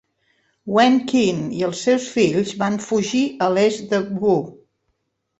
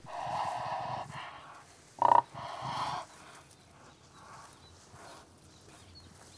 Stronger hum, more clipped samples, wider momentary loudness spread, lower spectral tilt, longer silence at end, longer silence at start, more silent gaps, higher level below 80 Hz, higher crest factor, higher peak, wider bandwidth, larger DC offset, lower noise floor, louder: neither; neither; second, 7 LU vs 28 LU; about the same, -5 dB/octave vs -4 dB/octave; first, 0.85 s vs 0 s; first, 0.65 s vs 0 s; neither; first, -60 dBFS vs -68 dBFS; second, 18 dB vs 28 dB; first, -2 dBFS vs -10 dBFS; second, 8.2 kHz vs 11 kHz; neither; first, -72 dBFS vs -57 dBFS; first, -19 LUFS vs -33 LUFS